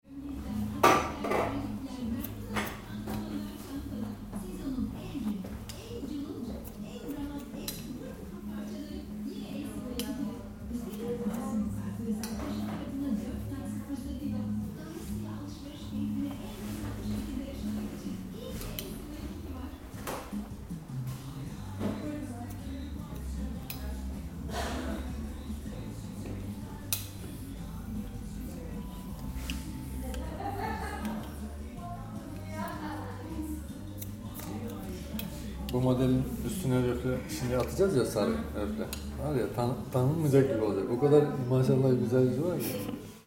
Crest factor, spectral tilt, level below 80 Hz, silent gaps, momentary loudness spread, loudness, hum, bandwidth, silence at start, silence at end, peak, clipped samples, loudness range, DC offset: 26 dB; -6.5 dB/octave; -46 dBFS; none; 14 LU; -34 LUFS; none; 16.5 kHz; 0.05 s; 0.05 s; -6 dBFS; under 0.1%; 11 LU; under 0.1%